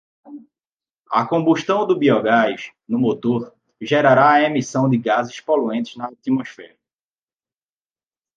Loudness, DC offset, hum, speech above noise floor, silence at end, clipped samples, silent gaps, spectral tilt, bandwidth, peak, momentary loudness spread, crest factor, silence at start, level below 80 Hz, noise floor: -18 LUFS; under 0.1%; none; over 72 dB; 1.7 s; under 0.1%; 0.73-0.77 s, 1.00-1.05 s; -6 dB/octave; 7.6 kHz; -2 dBFS; 13 LU; 18 dB; 0.3 s; -66 dBFS; under -90 dBFS